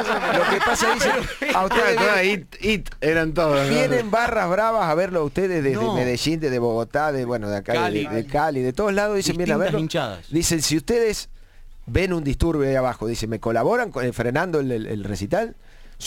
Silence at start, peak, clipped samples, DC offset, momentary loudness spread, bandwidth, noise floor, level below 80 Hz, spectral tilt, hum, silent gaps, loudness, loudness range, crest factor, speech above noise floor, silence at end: 0 s; -4 dBFS; under 0.1%; under 0.1%; 7 LU; 17 kHz; -42 dBFS; -38 dBFS; -4.5 dB/octave; none; none; -21 LUFS; 3 LU; 18 dB; 20 dB; 0 s